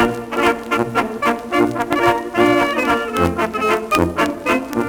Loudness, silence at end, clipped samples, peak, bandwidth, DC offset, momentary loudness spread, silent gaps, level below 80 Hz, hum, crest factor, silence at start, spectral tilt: -17 LUFS; 0 s; under 0.1%; 0 dBFS; over 20 kHz; under 0.1%; 4 LU; none; -44 dBFS; none; 18 dB; 0 s; -5 dB/octave